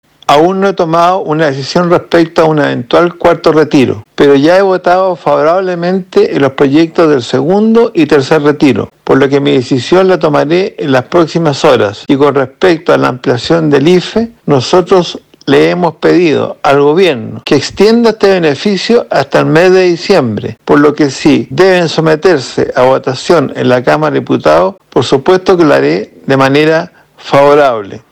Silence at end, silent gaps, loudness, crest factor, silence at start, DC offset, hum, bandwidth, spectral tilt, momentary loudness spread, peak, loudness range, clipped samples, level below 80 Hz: 0.15 s; none; -8 LUFS; 8 dB; 0.3 s; under 0.1%; none; 12.5 kHz; -6 dB/octave; 5 LU; 0 dBFS; 1 LU; 5%; -44 dBFS